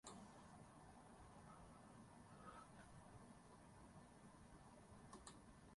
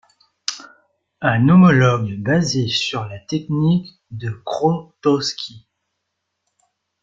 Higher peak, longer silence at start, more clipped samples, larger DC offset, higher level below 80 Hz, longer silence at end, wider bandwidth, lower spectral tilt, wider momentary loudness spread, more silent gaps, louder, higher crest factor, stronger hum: second, -42 dBFS vs -2 dBFS; second, 0.05 s vs 0.5 s; neither; neither; second, -74 dBFS vs -54 dBFS; second, 0 s vs 1.45 s; first, 11.5 kHz vs 7.6 kHz; second, -4.5 dB/octave vs -6 dB/octave; second, 4 LU vs 17 LU; neither; second, -64 LUFS vs -18 LUFS; about the same, 22 dB vs 18 dB; neither